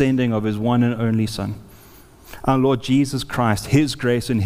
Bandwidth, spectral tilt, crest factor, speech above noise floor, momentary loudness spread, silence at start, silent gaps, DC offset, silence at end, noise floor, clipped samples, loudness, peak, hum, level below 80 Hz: 16 kHz; -6.5 dB/octave; 16 dB; 27 dB; 8 LU; 0 s; none; under 0.1%; 0 s; -46 dBFS; under 0.1%; -20 LUFS; -4 dBFS; none; -44 dBFS